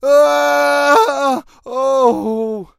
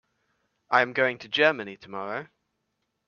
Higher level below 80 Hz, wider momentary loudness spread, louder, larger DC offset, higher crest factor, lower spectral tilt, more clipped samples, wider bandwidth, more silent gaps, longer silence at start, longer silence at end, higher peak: first, -56 dBFS vs -76 dBFS; second, 9 LU vs 14 LU; first, -14 LUFS vs -25 LUFS; neither; second, 14 dB vs 24 dB; second, -3 dB/octave vs -4.5 dB/octave; neither; first, 15.5 kHz vs 7 kHz; neither; second, 0 s vs 0.7 s; second, 0.15 s vs 0.85 s; first, 0 dBFS vs -4 dBFS